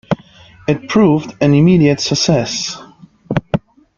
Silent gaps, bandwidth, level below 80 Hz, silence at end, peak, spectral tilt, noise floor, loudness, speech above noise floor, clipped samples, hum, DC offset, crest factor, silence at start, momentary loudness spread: none; 7.6 kHz; -44 dBFS; 0.4 s; -2 dBFS; -5.5 dB/octave; -42 dBFS; -15 LUFS; 30 dB; under 0.1%; none; under 0.1%; 14 dB; 0.1 s; 12 LU